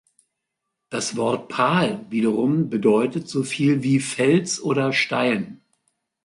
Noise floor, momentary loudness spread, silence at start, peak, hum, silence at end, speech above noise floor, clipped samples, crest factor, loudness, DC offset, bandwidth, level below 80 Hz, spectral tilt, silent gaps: -80 dBFS; 7 LU; 0.9 s; -6 dBFS; none; 0.7 s; 60 dB; under 0.1%; 16 dB; -21 LUFS; under 0.1%; 11.5 kHz; -64 dBFS; -5 dB/octave; none